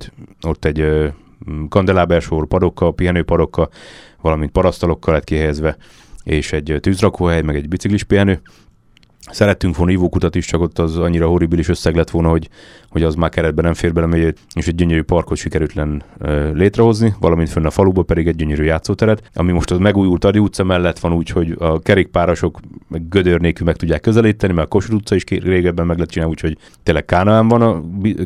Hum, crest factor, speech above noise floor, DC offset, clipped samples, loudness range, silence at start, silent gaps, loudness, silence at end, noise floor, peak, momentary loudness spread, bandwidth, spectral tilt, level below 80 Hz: none; 16 dB; 36 dB; under 0.1%; under 0.1%; 2 LU; 0 s; none; -16 LUFS; 0 s; -51 dBFS; 0 dBFS; 7 LU; 12 kHz; -7 dB/octave; -28 dBFS